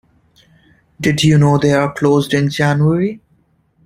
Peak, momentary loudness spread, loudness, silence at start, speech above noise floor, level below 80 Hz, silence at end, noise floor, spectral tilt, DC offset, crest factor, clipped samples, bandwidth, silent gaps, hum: 0 dBFS; 8 LU; -14 LUFS; 1 s; 44 dB; -46 dBFS; 0.7 s; -57 dBFS; -6.5 dB/octave; under 0.1%; 14 dB; under 0.1%; 15 kHz; none; none